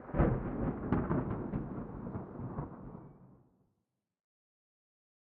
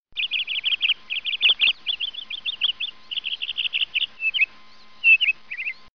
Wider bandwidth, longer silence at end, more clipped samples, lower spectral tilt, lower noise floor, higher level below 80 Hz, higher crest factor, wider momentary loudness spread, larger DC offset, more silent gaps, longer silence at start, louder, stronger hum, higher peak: second, 3.6 kHz vs 6.6 kHz; first, 1.85 s vs 0.2 s; neither; first, -10 dB/octave vs 6.5 dB/octave; first, -86 dBFS vs -51 dBFS; first, -48 dBFS vs -64 dBFS; about the same, 22 dB vs 18 dB; first, 17 LU vs 12 LU; second, under 0.1% vs 0.4%; neither; second, 0 s vs 0.15 s; second, -37 LUFS vs -21 LUFS; neither; second, -16 dBFS vs -6 dBFS